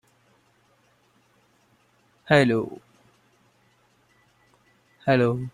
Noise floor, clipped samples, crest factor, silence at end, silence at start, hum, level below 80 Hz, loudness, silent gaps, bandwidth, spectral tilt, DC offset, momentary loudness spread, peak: -63 dBFS; under 0.1%; 24 dB; 0.05 s; 2.3 s; none; -64 dBFS; -22 LUFS; none; 12 kHz; -7 dB/octave; under 0.1%; 16 LU; -4 dBFS